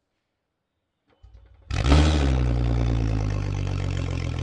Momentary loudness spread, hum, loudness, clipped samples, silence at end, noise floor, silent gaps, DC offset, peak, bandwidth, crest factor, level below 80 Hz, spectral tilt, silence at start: 9 LU; none; -24 LUFS; under 0.1%; 0 s; -79 dBFS; none; under 0.1%; -4 dBFS; 9.8 kHz; 20 dB; -28 dBFS; -6.5 dB/octave; 1.7 s